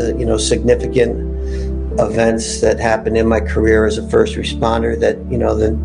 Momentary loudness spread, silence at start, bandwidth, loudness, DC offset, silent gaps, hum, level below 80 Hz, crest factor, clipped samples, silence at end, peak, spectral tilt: 6 LU; 0 s; 10.5 kHz; -16 LUFS; under 0.1%; none; none; -24 dBFS; 14 dB; under 0.1%; 0 s; 0 dBFS; -5.5 dB/octave